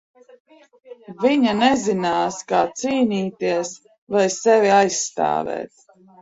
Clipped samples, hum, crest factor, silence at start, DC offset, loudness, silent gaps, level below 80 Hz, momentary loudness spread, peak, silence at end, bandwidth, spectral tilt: under 0.1%; none; 18 dB; 0.9 s; under 0.1%; -19 LUFS; 3.98-4.07 s; -62 dBFS; 10 LU; -4 dBFS; 0.55 s; 8 kHz; -4 dB/octave